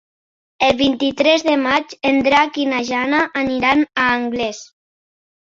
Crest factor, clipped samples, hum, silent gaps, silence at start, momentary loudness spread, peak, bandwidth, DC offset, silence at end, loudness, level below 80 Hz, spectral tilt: 18 dB; under 0.1%; none; none; 0.6 s; 6 LU; 0 dBFS; 7.6 kHz; under 0.1%; 0.95 s; -16 LUFS; -50 dBFS; -3.5 dB/octave